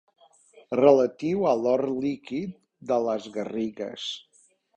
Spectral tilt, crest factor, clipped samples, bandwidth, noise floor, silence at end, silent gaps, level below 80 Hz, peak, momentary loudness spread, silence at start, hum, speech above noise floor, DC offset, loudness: -6 dB/octave; 22 dB; under 0.1%; 9.2 kHz; -56 dBFS; 0.6 s; none; -68 dBFS; -4 dBFS; 15 LU; 0.7 s; none; 31 dB; under 0.1%; -26 LUFS